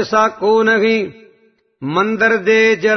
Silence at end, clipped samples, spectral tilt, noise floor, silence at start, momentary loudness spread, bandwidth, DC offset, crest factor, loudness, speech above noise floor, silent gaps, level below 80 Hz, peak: 0 s; under 0.1%; -5 dB/octave; -56 dBFS; 0 s; 8 LU; 6.4 kHz; under 0.1%; 14 dB; -14 LUFS; 42 dB; none; -60 dBFS; -2 dBFS